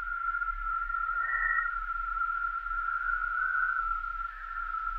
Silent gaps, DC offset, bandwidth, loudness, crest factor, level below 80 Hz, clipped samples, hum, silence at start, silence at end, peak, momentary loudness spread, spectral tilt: none; under 0.1%; 5.2 kHz; -31 LUFS; 16 dB; -46 dBFS; under 0.1%; none; 0 s; 0 s; -16 dBFS; 6 LU; -3 dB/octave